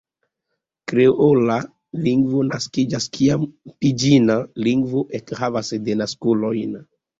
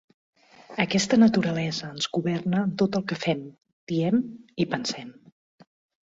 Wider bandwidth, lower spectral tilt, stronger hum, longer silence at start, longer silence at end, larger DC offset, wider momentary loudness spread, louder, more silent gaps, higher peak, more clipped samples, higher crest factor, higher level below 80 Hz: about the same, 7.8 kHz vs 8 kHz; about the same, -6 dB/octave vs -5.5 dB/octave; neither; first, 0.9 s vs 0.7 s; second, 0.35 s vs 0.9 s; neither; second, 10 LU vs 15 LU; first, -19 LUFS vs -25 LUFS; second, none vs 3.73-3.87 s; first, -2 dBFS vs -6 dBFS; neither; about the same, 18 dB vs 20 dB; first, -56 dBFS vs -64 dBFS